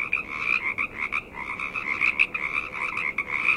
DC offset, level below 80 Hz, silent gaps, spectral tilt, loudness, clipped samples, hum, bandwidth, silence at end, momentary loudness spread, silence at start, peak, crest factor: under 0.1%; -54 dBFS; none; -3 dB/octave; -25 LUFS; under 0.1%; none; 15.5 kHz; 0 s; 7 LU; 0 s; -6 dBFS; 20 dB